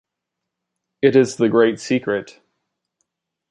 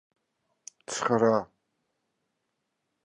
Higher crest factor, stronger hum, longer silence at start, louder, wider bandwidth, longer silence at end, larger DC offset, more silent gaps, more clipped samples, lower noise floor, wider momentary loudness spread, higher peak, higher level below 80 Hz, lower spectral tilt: about the same, 18 dB vs 20 dB; neither; first, 1.05 s vs 0.9 s; first, -18 LUFS vs -27 LUFS; about the same, 11 kHz vs 11.5 kHz; second, 1.2 s vs 1.6 s; neither; neither; neither; about the same, -82 dBFS vs -81 dBFS; second, 8 LU vs 22 LU; first, -2 dBFS vs -12 dBFS; first, -64 dBFS vs -74 dBFS; about the same, -5.5 dB/octave vs -5 dB/octave